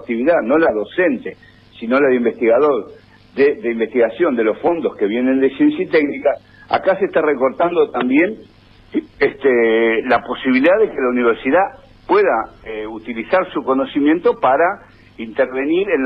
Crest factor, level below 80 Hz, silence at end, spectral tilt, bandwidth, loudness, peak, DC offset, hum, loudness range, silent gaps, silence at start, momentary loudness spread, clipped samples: 12 dB; -52 dBFS; 0 s; -8 dB/octave; 5.6 kHz; -16 LUFS; -4 dBFS; under 0.1%; none; 2 LU; none; 0 s; 11 LU; under 0.1%